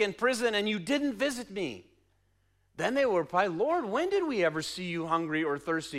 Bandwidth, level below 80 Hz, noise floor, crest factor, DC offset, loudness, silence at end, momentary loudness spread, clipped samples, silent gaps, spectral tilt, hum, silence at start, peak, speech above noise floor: 15.5 kHz; -66 dBFS; -71 dBFS; 18 dB; under 0.1%; -30 LUFS; 0 s; 7 LU; under 0.1%; none; -4.5 dB/octave; none; 0 s; -14 dBFS; 41 dB